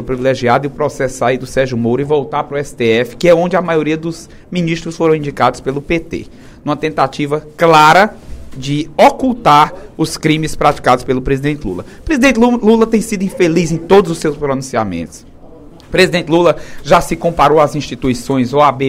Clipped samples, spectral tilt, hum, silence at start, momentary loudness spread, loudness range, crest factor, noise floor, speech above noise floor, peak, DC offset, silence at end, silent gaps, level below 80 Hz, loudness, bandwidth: 0.2%; -5.5 dB/octave; none; 0 s; 10 LU; 4 LU; 12 dB; -36 dBFS; 23 dB; 0 dBFS; under 0.1%; 0 s; none; -34 dBFS; -13 LUFS; 16.5 kHz